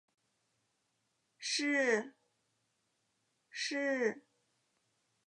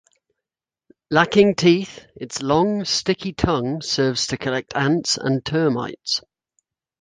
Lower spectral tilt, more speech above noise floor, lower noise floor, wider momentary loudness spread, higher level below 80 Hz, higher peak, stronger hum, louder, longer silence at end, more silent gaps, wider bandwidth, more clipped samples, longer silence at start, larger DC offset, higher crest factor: second, -2 dB/octave vs -4.5 dB/octave; second, 47 dB vs 68 dB; second, -81 dBFS vs -88 dBFS; first, 18 LU vs 9 LU; second, under -90 dBFS vs -48 dBFS; second, -18 dBFS vs -2 dBFS; neither; second, -34 LUFS vs -20 LUFS; first, 1.1 s vs 0.8 s; neither; about the same, 11 kHz vs 10 kHz; neither; first, 1.4 s vs 1.1 s; neither; about the same, 22 dB vs 20 dB